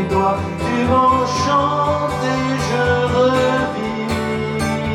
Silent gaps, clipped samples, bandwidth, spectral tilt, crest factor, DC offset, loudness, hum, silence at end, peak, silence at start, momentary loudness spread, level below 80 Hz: none; under 0.1%; 14.5 kHz; -5.5 dB/octave; 14 dB; under 0.1%; -17 LUFS; none; 0 s; -2 dBFS; 0 s; 6 LU; -42 dBFS